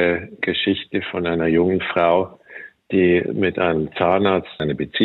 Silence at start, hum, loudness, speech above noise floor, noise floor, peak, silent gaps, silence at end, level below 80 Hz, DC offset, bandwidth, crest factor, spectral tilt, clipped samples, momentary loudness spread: 0 s; none; -20 LUFS; 22 dB; -41 dBFS; -4 dBFS; none; 0 s; -54 dBFS; under 0.1%; 4.3 kHz; 16 dB; -9 dB/octave; under 0.1%; 8 LU